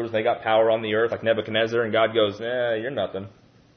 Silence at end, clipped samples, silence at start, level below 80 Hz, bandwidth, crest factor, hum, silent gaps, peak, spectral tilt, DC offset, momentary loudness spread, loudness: 0.45 s; under 0.1%; 0 s; -66 dBFS; 6.4 kHz; 16 dB; none; none; -8 dBFS; -6 dB/octave; under 0.1%; 8 LU; -23 LUFS